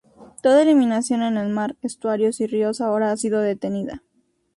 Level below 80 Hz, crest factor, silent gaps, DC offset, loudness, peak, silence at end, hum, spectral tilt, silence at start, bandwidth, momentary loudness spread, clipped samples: -62 dBFS; 16 dB; none; under 0.1%; -21 LUFS; -6 dBFS; 0.6 s; none; -5.5 dB/octave; 0.2 s; 11.5 kHz; 11 LU; under 0.1%